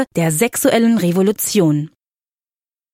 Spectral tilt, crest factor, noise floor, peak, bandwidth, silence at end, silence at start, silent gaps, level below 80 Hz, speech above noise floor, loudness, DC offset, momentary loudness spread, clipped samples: -5 dB/octave; 16 dB; under -90 dBFS; 0 dBFS; 16.5 kHz; 1.05 s; 0 s; none; -58 dBFS; over 75 dB; -15 LUFS; under 0.1%; 4 LU; under 0.1%